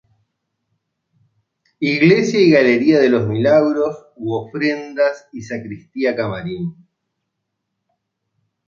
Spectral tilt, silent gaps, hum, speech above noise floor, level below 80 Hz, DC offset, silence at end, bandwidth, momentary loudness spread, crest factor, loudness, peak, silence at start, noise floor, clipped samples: -6.5 dB/octave; none; none; 60 dB; -58 dBFS; under 0.1%; 1.95 s; 7.4 kHz; 16 LU; 16 dB; -16 LUFS; -2 dBFS; 1.8 s; -76 dBFS; under 0.1%